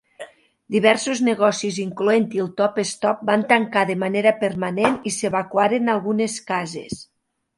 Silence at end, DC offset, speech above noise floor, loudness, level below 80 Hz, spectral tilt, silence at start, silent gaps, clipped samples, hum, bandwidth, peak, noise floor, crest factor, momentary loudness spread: 0.55 s; under 0.1%; 22 dB; -20 LUFS; -62 dBFS; -4.5 dB/octave; 0.2 s; none; under 0.1%; none; 11.5 kHz; 0 dBFS; -42 dBFS; 20 dB; 9 LU